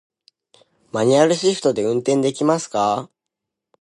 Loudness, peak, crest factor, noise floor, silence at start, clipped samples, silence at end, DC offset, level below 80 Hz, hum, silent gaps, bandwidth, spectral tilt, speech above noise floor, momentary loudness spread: -19 LUFS; -2 dBFS; 18 dB; -82 dBFS; 0.95 s; under 0.1%; 0.75 s; under 0.1%; -66 dBFS; none; none; 11.5 kHz; -5 dB/octave; 65 dB; 6 LU